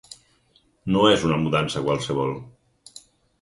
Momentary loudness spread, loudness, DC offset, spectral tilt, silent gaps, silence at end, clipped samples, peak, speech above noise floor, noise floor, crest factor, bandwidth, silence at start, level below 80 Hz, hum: 12 LU; -22 LUFS; under 0.1%; -5.5 dB/octave; none; 0.4 s; under 0.1%; -4 dBFS; 41 dB; -62 dBFS; 20 dB; 11.5 kHz; 0.1 s; -52 dBFS; none